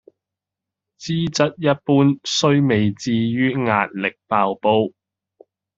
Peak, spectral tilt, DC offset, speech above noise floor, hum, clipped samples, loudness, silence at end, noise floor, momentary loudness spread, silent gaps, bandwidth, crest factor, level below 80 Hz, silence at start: -2 dBFS; -5.5 dB/octave; under 0.1%; 67 dB; none; under 0.1%; -19 LUFS; 0.9 s; -86 dBFS; 7 LU; none; 7.8 kHz; 18 dB; -58 dBFS; 1 s